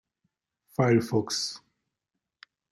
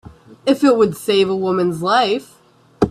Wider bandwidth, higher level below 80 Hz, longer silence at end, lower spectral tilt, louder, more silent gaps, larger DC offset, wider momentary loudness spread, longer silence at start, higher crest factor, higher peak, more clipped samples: about the same, 13 kHz vs 14 kHz; second, -70 dBFS vs -48 dBFS; first, 1.15 s vs 0 s; about the same, -5 dB/octave vs -5.5 dB/octave; second, -27 LUFS vs -17 LUFS; neither; neither; first, 13 LU vs 7 LU; first, 0.8 s vs 0.05 s; about the same, 20 dB vs 16 dB; second, -10 dBFS vs 0 dBFS; neither